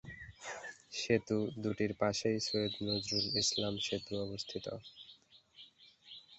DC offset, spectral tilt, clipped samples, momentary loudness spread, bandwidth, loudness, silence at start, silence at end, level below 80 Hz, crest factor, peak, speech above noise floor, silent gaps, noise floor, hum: under 0.1%; -4 dB/octave; under 0.1%; 21 LU; 8.2 kHz; -36 LUFS; 0.05 s; 0 s; -66 dBFS; 22 dB; -16 dBFS; 26 dB; none; -62 dBFS; none